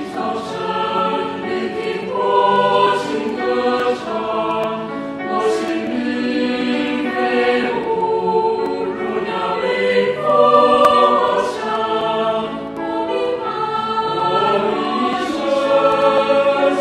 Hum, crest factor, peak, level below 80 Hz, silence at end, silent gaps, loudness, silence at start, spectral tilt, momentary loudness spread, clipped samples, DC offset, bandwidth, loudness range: none; 16 dB; 0 dBFS; -56 dBFS; 0 s; none; -17 LUFS; 0 s; -5 dB/octave; 9 LU; under 0.1%; under 0.1%; 12.5 kHz; 5 LU